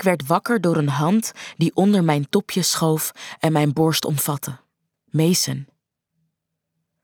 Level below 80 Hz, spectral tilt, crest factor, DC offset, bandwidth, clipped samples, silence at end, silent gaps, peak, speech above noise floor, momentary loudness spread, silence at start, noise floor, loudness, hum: -64 dBFS; -5 dB/octave; 18 dB; under 0.1%; over 20 kHz; under 0.1%; 1.4 s; none; -4 dBFS; 58 dB; 9 LU; 0 s; -78 dBFS; -20 LUFS; none